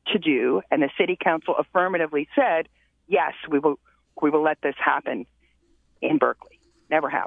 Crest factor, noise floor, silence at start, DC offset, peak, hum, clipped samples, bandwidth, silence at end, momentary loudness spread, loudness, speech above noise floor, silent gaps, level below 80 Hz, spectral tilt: 20 dB; -63 dBFS; 0.05 s; under 0.1%; -4 dBFS; none; under 0.1%; 3.9 kHz; 0 s; 5 LU; -23 LUFS; 40 dB; none; -68 dBFS; -8 dB/octave